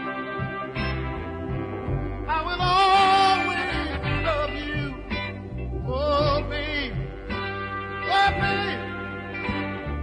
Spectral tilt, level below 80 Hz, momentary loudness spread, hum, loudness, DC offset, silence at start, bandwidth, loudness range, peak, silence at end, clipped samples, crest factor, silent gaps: -5.5 dB/octave; -38 dBFS; 13 LU; none; -25 LUFS; under 0.1%; 0 s; 11 kHz; 5 LU; -10 dBFS; 0 s; under 0.1%; 16 dB; none